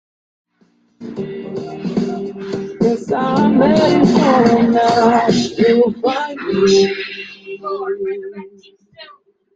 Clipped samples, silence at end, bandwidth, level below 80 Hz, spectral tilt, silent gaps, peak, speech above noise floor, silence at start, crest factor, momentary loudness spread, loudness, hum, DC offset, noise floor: under 0.1%; 0.5 s; 7.8 kHz; -52 dBFS; -6 dB/octave; none; -2 dBFS; 44 dB; 1 s; 14 dB; 16 LU; -15 LUFS; none; under 0.1%; -57 dBFS